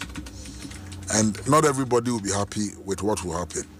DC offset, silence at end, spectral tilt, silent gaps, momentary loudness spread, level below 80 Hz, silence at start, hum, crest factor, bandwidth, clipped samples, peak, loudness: under 0.1%; 0 s; -4.5 dB/octave; none; 18 LU; -46 dBFS; 0 s; none; 20 dB; 15.5 kHz; under 0.1%; -6 dBFS; -24 LUFS